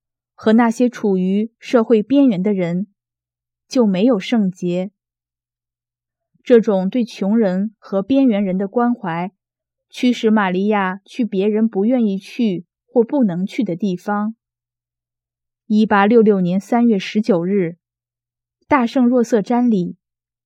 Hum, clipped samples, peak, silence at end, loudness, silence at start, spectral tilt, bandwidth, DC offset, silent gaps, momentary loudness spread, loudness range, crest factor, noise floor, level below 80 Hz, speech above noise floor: none; under 0.1%; 0 dBFS; 0.55 s; -17 LUFS; 0.4 s; -7.5 dB/octave; 9.2 kHz; under 0.1%; none; 9 LU; 4 LU; 18 dB; -89 dBFS; -66 dBFS; 73 dB